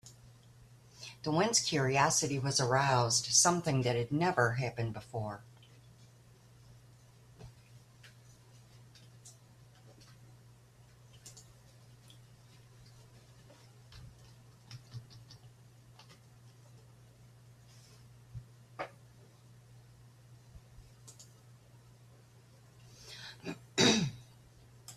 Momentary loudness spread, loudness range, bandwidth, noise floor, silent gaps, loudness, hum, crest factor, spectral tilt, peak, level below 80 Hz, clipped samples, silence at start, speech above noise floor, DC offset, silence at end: 28 LU; 28 LU; 14.5 kHz; -60 dBFS; none; -31 LUFS; none; 26 dB; -3.5 dB/octave; -12 dBFS; -66 dBFS; under 0.1%; 0.05 s; 29 dB; under 0.1%; 0 s